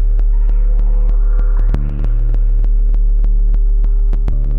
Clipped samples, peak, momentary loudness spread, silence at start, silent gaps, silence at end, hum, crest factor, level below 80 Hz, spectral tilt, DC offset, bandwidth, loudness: under 0.1%; -6 dBFS; 2 LU; 0 s; none; 0 s; none; 4 dB; -10 dBFS; -10 dB/octave; under 0.1%; 1.7 kHz; -18 LUFS